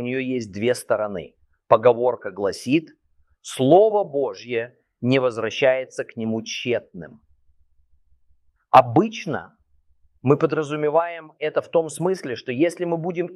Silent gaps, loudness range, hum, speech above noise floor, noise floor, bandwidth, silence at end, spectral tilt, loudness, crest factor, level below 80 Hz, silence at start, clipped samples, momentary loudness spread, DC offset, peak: none; 4 LU; none; 39 dB; -60 dBFS; 13 kHz; 0 s; -6 dB/octave; -22 LUFS; 22 dB; -64 dBFS; 0 s; under 0.1%; 13 LU; under 0.1%; 0 dBFS